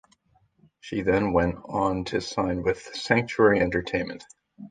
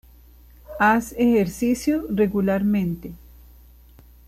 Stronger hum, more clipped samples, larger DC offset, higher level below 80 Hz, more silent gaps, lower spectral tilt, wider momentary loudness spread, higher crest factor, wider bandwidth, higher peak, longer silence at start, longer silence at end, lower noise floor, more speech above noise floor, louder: second, none vs 60 Hz at -40 dBFS; neither; neither; about the same, -46 dBFS vs -46 dBFS; neither; about the same, -6 dB/octave vs -6.5 dB/octave; about the same, 11 LU vs 12 LU; first, 22 dB vs 16 dB; second, 9.4 kHz vs 15 kHz; first, -4 dBFS vs -8 dBFS; first, 0.85 s vs 0.7 s; second, 0 s vs 1.1 s; first, -65 dBFS vs -49 dBFS; first, 41 dB vs 28 dB; second, -25 LUFS vs -21 LUFS